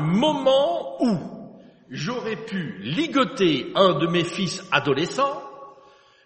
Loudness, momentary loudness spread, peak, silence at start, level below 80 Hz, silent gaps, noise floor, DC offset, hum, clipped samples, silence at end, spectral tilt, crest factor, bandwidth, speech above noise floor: -23 LUFS; 12 LU; -2 dBFS; 0 s; -64 dBFS; none; -53 dBFS; under 0.1%; none; under 0.1%; 0.55 s; -5.5 dB/octave; 20 dB; 8.8 kHz; 31 dB